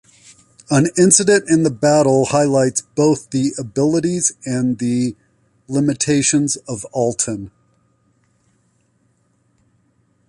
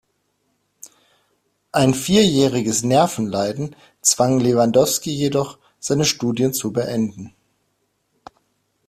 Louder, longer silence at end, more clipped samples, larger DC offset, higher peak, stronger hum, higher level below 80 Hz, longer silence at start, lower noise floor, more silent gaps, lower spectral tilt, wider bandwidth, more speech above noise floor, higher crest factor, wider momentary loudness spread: about the same, -16 LUFS vs -18 LUFS; first, 2.8 s vs 1.6 s; neither; neither; about the same, 0 dBFS vs 0 dBFS; neither; about the same, -54 dBFS vs -54 dBFS; second, 0.7 s vs 0.85 s; second, -61 dBFS vs -69 dBFS; neither; about the same, -4.5 dB/octave vs -4.5 dB/octave; second, 11.5 kHz vs 16 kHz; second, 45 dB vs 51 dB; about the same, 18 dB vs 20 dB; about the same, 9 LU vs 11 LU